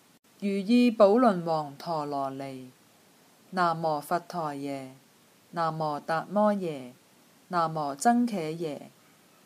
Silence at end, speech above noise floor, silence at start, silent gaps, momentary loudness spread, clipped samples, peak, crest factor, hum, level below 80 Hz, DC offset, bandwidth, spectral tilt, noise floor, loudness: 0.6 s; 33 dB; 0.4 s; none; 17 LU; under 0.1%; -8 dBFS; 20 dB; none; -80 dBFS; under 0.1%; 15 kHz; -6 dB/octave; -60 dBFS; -28 LUFS